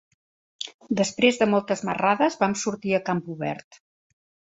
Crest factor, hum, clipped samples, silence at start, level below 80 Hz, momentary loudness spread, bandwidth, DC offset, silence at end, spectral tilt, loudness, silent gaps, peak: 22 dB; none; under 0.1%; 0.6 s; -66 dBFS; 15 LU; 8 kHz; under 0.1%; 0.9 s; -4.5 dB/octave; -24 LUFS; 0.74-0.79 s; -4 dBFS